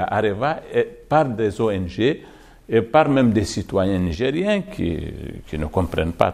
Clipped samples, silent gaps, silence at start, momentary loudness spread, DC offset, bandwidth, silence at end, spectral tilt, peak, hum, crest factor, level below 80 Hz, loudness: under 0.1%; none; 0 s; 10 LU; under 0.1%; 14.5 kHz; 0 s; -6.5 dB/octave; 0 dBFS; none; 20 dB; -42 dBFS; -21 LUFS